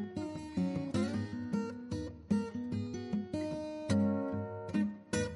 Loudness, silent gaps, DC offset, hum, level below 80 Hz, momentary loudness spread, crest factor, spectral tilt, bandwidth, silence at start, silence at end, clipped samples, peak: -37 LUFS; none; under 0.1%; none; -60 dBFS; 8 LU; 16 dB; -6.5 dB/octave; 11.5 kHz; 0 s; 0 s; under 0.1%; -20 dBFS